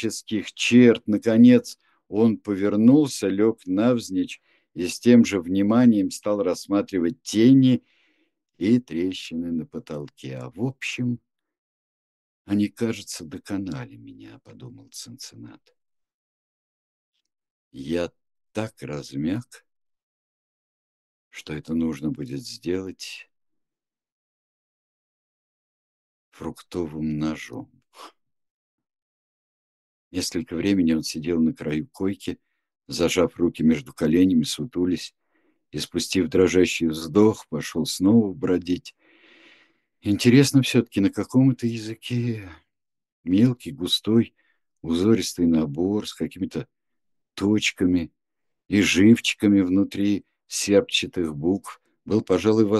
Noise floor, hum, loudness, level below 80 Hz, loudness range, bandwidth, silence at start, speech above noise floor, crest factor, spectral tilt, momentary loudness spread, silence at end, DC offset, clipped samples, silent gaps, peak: -89 dBFS; none; -22 LUFS; -56 dBFS; 14 LU; 12.5 kHz; 0 s; 67 dB; 20 dB; -5.5 dB/octave; 18 LU; 0 s; under 0.1%; under 0.1%; 11.58-12.45 s, 16.14-17.12 s, 17.50-17.71 s, 20.03-21.31 s, 24.12-26.32 s, 28.51-28.78 s, 29.02-30.11 s, 43.12-43.24 s; -4 dBFS